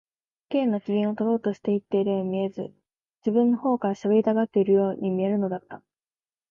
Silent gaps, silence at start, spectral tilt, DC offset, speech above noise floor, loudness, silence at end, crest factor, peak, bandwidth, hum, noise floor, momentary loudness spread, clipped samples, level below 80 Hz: 3.01-3.14 s; 0.5 s; -9 dB/octave; under 0.1%; over 66 dB; -25 LUFS; 0.7 s; 16 dB; -10 dBFS; 6.8 kHz; none; under -90 dBFS; 9 LU; under 0.1%; -72 dBFS